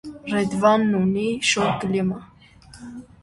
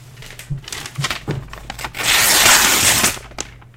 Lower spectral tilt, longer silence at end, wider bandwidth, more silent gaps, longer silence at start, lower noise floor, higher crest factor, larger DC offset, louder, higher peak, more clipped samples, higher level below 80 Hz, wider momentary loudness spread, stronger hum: first, -5 dB/octave vs -0.5 dB/octave; about the same, 0.2 s vs 0.2 s; second, 11.5 kHz vs 17 kHz; neither; about the same, 0.05 s vs 0 s; first, -48 dBFS vs -37 dBFS; about the same, 18 dB vs 18 dB; neither; second, -21 LUFS vs -13 LUFS; second, -4 dBFS vs 0 dBFS; neither; second, -54 dBFS vs -40 dBFS; about the same, 21 LU vs 21 LU; neither